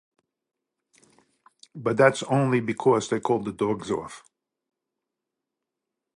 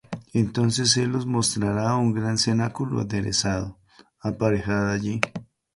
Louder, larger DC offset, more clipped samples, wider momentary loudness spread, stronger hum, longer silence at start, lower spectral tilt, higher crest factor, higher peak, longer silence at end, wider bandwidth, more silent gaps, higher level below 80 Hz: about the same, -24 LUFS vs -24 LUFS; neither; neither; first, 11 LU vs 8 LU; neither; first, 1.75 s vs 0.1 s; first, -6 dB/octave vs -4.5 dB/octave; about the same, 24 dB vs 22 dB; about the same, -4 dBFS vs -2 dBFS; first, 2 s vs 0.35 s; about the same, 11.5 kHz vs 11.5 kHz; neither; second, -66 dBFS vs -48 dBFS